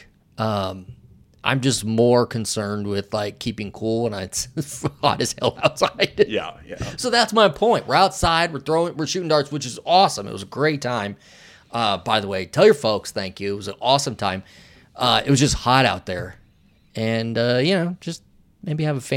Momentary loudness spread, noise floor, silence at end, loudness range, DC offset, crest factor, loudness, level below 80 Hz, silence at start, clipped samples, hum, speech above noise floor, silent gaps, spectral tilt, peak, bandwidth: 13 LU; -56 dBFS; 0 s; 4 LU; under 0.1%; 20 dB; -21 LUFS; -46 dBFS; 0.4 s; under 0.1%; none; 35 dB; none; -4.5 dB/octave; 0 dBFS; 17 kHz